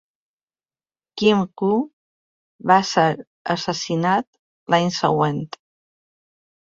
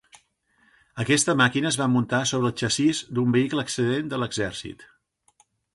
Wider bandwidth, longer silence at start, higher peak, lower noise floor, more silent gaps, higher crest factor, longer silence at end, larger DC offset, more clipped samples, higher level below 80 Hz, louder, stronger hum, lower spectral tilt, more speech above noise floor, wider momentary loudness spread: second, 7.8 kHz vs 11.5 kHz; first, 1.15 s vs 0.15 s; first, -2 dBFS vs -6 dBFS; first, under -90 dBFS vs -65 dBFS; first, 1.93-2.59 s, 3.27-3.45 s, 4.27-4.33 s, 4.39-4.66 s vs none; about the same, 20 dB vs 18 dB; first, 1.3 s vs 0.9 s; neither; neither; about the same, -62 dBFS vs -58 dBFS; first, -20 LUFS vs -23 LUFS; neither; about the same, -5 dB/octave vs -4 dB/octave; first, over 71 dB vs 41 dB; first, 15 LU vs 10 LU